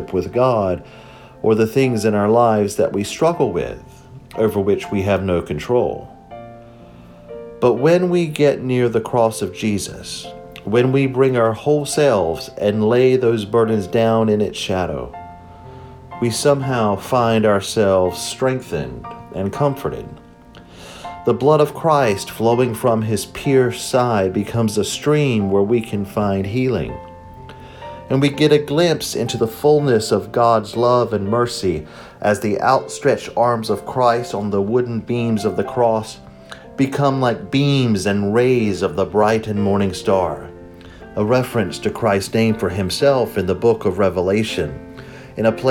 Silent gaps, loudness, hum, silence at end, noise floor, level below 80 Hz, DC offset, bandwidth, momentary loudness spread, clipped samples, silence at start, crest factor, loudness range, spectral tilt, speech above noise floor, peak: none; -18 LUFS; none; 0 s; -42 dBFS; -48 dBFS; under 0.1%; 18.5 kHz; 17 LU; under 0.1%; 0 s; 16 dB; 3 LU; -6 dB/octave; 25 dB; -2 dBFS